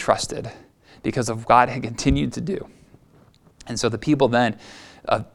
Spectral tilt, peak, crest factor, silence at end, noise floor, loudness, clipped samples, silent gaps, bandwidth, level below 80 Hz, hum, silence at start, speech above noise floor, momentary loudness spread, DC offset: -5 dB/octave; 0 dBFS; 22 dB; 0.1 s; -54 dBFS; -22 LUFS; under 0.1%; none; 12.5 kHz; -40 dBFS; none; 0 s; 33 dB; 18 LU; under 0.1%